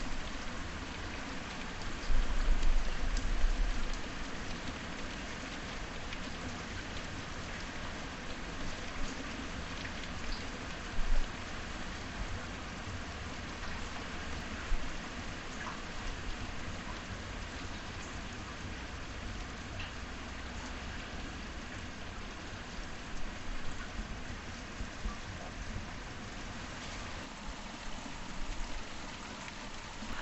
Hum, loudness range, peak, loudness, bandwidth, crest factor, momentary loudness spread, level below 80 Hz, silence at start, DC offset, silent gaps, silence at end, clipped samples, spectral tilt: none; 5 LU; -18 dBFS; -42 LUFS; 8.4 kHz; 20 dB; 6 LU; -40 dBFS; 0 s; under 0.1%; none; 0 s; under 0.1%; -4 dB/octave